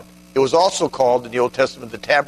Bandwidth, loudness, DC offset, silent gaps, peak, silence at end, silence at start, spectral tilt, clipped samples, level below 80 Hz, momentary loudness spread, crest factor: 13.5 kHz; -18 LUFS; under 0.1%; none; -2 dBFS; 0.05 s; 0.35 s; -3.5 dB/octave; under 0.1%; -54 dBFS; 7 LU; 16 dB